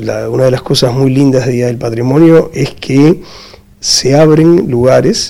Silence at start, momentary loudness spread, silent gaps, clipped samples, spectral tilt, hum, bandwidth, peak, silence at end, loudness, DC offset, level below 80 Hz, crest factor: 0 s; 9 LU; none; 1%; -5.5 dB/octave; none; 16 kHz; 0 dBFS; 0 s; -9 LUFS; under 0.1%; -38 dBFS; 8 dB